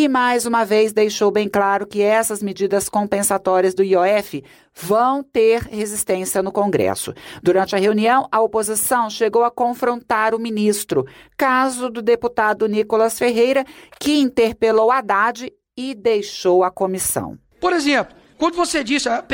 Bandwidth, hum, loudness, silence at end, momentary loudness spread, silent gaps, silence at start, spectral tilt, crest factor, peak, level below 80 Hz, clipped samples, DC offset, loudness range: 17 kHz; none; -18 LUFS; 0 s; 6 LU; none; 0 s; -3.5 dB/octave; 12 dB; -6 dBFS; -54 dBFS; under 0.1%; under 0.1%; 2 LU